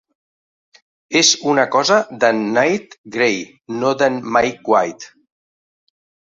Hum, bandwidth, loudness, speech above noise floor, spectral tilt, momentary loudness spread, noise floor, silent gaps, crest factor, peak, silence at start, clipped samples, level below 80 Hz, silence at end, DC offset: none; 8.4 kHz; -16 LUFS; over 73 dB; -2.5 dB/octave; 12 LU; under -90 dBFS; 2.98-3.04 s; 18 dB; 0 dBFS; 1.1 s; under 0.1%; -60 dBFS; 1.35 s; under 0.1%